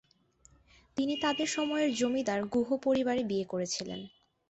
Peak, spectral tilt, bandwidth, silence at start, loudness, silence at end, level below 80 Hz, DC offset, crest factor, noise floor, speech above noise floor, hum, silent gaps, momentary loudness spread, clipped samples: -18 dBFS; -4 dB/octave; 8.2 kHz; 0.95 s; -31 LUFS; 0.4 s; -68 dBFS; under 0.1%; 14 dB; -65 dBFS; 34 dB; none; none; 10 LU; under 0.1%